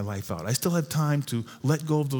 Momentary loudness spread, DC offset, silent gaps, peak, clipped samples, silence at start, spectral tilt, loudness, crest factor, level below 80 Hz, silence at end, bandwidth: 7 LU; under 0.1%; none; -10 dBFS; under 0.1%; 0 s; -5.5 dB/octave; -27 LUFS; 16 dB; -62 dBFS; 0 s; over 20 kHz